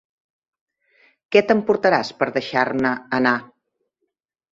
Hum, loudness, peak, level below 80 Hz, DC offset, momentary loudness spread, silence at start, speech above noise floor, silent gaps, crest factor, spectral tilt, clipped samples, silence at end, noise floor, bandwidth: none; -20 LUFS; -2 dBFS; -62 dBFS; under 0.1%; 6 LU; 1.3 s; 58 dB; none; 20 dB; -5.5 dB/octave; under 0.1%; 1.05 s; -77 dBFS; 7.6 kHz